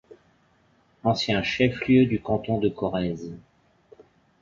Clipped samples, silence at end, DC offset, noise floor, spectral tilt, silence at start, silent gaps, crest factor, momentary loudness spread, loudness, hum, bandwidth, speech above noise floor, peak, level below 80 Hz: under 0.1%; 1.05 s; under 0.1%; -63 dBFS; -6.5 dB/octave; 1.05 s; none; 20 dB; 13 LU; -24 LUFS; none; 7.4 kHz; 39 dB; -6 dBFS; -52 dBFS